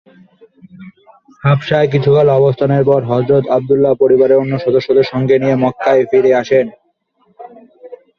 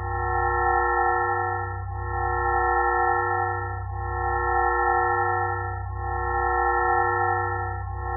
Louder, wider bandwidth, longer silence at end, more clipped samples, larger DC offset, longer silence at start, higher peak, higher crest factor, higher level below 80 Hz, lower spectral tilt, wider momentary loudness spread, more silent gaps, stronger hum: first, -12 LUFS vs -24 LUFS; first, 6.4 kHz vs 2 kHz; first, 0.25 s vs 0 s; neither; neither; first, 0.8 s vs 0 s; first, -2 dBFS vs -10 dBFS; about the same, 12 dB vs 14 dB; second, -52 dBFS vs -36 dBFS; first, -8.5 dB/octave vs -1 dB/octave; second, 4 LU vs 9 LU; neither; neither